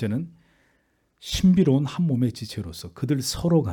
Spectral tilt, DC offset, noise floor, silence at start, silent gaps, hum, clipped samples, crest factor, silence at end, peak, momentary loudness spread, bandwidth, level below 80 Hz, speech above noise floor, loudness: -6.5 dB/octave; under 0.1%; -68 dBFS; 0 s; none; none; under 0.1%; 14 dB; 0 s; -10 dBFS; 16 LU; 18 kHz; -46 dBFS; 45 dB; -23 LUFS